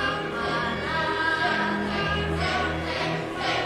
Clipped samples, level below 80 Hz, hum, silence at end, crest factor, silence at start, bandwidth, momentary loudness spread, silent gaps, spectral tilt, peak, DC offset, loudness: under 0.1%; -42 dBFS; none; 0 s; 14 dB; 0 s; 13.5 kHz; 4 LU; none; -5 dB/octave; -12 dBFS; under 0.1%; -26 LUFS